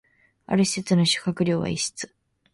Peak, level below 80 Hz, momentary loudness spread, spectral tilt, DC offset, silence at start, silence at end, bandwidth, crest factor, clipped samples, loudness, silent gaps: -8 dBFS; -56 dBFS; 10 LU; -4.5 dB/octave; under 0.1%; 0.5 s; 0.45 s; 11.5 kHz; 18 dB; under 0.1%; -23 LUFS; none